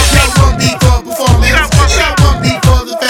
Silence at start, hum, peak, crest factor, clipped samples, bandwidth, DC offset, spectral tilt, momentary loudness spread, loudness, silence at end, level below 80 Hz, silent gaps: 0 s; none; 0 dBFS; 8 dB; 1%; 17 kHz; under 0.1%; -4 dB/octave; 3 LU; -9 LUFS; 0 s; -14 dBFS; none